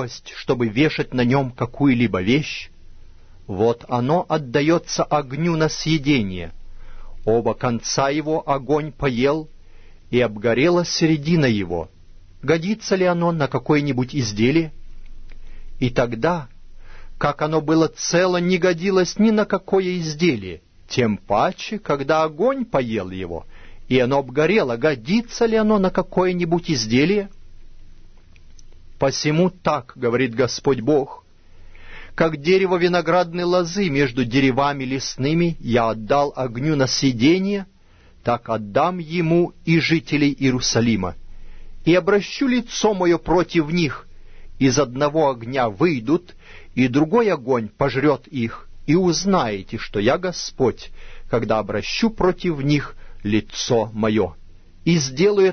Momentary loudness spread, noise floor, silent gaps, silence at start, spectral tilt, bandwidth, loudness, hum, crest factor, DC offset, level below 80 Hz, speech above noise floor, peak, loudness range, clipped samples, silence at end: 9 LU; -49 dBFS; none; 0 s; -5.5 dB/octave; 6.6 kHz; -20 LUFS; none; 18 dB; under 0.1%; -40 dBFS; 30 dB; -2 dBFS; 3 LU; under 0.1%; 0 s